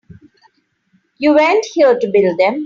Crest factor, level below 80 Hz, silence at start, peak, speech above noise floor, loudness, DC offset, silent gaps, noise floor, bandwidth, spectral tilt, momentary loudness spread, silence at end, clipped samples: 14 dB; -60 dBFS; 1.2 s; -2 dBFS; 48 dB; -13 LUFS; under 0.1%; none; -60 dBFS; 7.6 kHz; -5 dB/octave; 3 LU; 0 s; under 0.1%